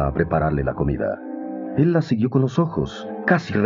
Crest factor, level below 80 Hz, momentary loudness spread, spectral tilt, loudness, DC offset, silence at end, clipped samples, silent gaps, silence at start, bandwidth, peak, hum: 18 dB; -38 dBFS; 9 LU; -8.5 dB/octave; -22 LUFS; under 0.1%; 0 s; under 0.1%; none; 0 s; 7.4 kHz; -2 dBFS; none